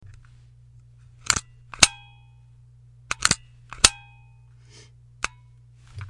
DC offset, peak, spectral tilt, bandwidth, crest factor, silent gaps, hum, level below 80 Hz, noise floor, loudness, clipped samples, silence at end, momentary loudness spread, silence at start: under 0.1%; 0 dBFS; 0 dB/octave; 12 kHz; 28 dB; none; none; -46 dBFS; -51 dBFS; -22 LUFS; under 0.1%; 0.05 s; 27 LU; 1.3 s